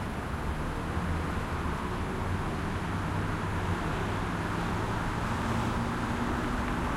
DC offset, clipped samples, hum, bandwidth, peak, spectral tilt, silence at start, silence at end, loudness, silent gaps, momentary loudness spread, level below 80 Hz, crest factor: under 0.1%; under 0.1%; none; 16 kHz; -18 dBFS; -6 dB/octave; 0 s; 0 s; -32 LUFS; none; 3 LU; -40 dBFS; 14 dB